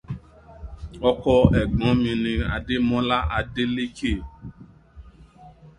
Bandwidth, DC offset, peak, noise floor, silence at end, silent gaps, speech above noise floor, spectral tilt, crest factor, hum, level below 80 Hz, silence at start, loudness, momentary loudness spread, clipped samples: 10 kHz; under 0.1%; 0 dBFS; -48 dBFS; 0.1 s; none; 26 dB; -7.5 dB/octave; 24 dB; none; -34 dBFS; 0.1 s; -22 LUFS; 22 LU; under 0.1%